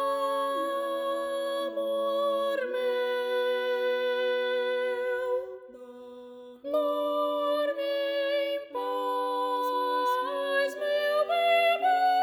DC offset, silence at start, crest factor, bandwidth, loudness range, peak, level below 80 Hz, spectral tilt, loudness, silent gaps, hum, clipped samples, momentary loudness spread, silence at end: under 0.1%; 0 s; 12 dB; over 20 kHz; 4 LU; -16 dBFS; -78 dBFS; -2 dB/octave; -28 LUFS; none; none; under 0.1%; 8 LU; 0 s